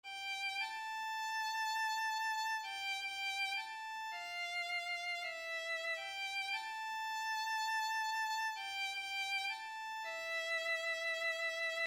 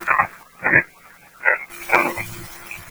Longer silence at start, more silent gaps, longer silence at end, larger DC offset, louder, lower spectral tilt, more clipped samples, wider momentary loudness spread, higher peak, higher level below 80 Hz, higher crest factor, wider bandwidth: about the same, 0.05 s vs 0 s; neither; about the same, 0 s vs 0 s; neither; second, -38 LUFS vs -19 LUFS; second, 2.5 dB/octave vs -4 dB/octave; neither; second, 5 LU vs 18 LU; second, -30 dBFS vs 0 dBFS; second, -82 dBFS vs -52 dBFS; second, 12 dB vs 22 dB; about the same, over 20 kHz vs over 20 kHz